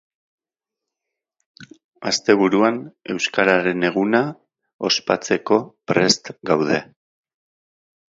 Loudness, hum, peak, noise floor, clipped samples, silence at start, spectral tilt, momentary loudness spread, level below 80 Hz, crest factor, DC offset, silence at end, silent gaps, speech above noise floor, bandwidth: -19 LUFS; none; 0 dBFS; -87 dBFS; under 0.1%; 1.6 s; -4 dB/octave; 8 LU; -64 dBFS; 22 dB; under 0.1%; 1.35 s; 1.84-1.92 s, 4.74-4.79 s; 68 dB; 8 kHz